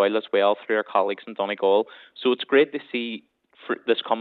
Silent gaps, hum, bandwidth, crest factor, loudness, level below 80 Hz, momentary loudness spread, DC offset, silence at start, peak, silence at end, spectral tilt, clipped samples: none; none; 4.5 kHz; 18 dB; -24 LUFS; -86 dBFS; 12 LU; under 0.1%; 0 s; -6 dBFS; 0 s; -7 dB/octave; under 0.1%